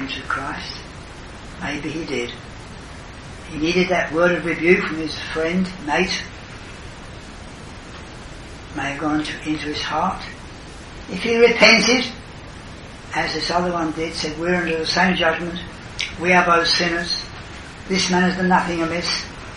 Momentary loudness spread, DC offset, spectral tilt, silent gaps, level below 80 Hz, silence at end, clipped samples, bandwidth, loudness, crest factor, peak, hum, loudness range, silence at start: 21 LU; under 0.1%; -4 dB/octave; none; -42 dBFS; 0 s; under 0.1%; 11.5 kHz; -19 LUFS; 22 dB; 0 dBFS; none; 10 LU; 0 s